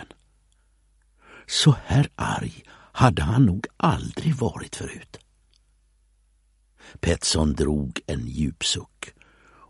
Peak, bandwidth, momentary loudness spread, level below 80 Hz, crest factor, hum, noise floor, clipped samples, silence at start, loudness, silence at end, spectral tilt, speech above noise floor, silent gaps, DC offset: -2 dBFS; 11.5 kHz; 16 LU; -40 dBFS; 24 dB; 50 Hz at -50 dBFS; -63 dBFS; under 0.1%; 0 s; -23 LUFS; 0.6 s; -5 dB/octave; 40 dB; none; under 0.1%